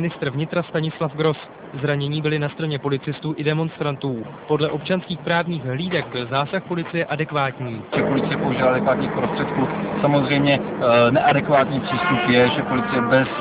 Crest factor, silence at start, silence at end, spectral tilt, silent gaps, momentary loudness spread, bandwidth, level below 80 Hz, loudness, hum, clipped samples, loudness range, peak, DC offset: 18 dB; 0 s; 0 s; -10.5 dB/octave; none; 9 LU; 4 kHz; -52 dBFS; -21 LUFS; none; under 0.1%; 6 LU; -4 dBFS; under 0.1%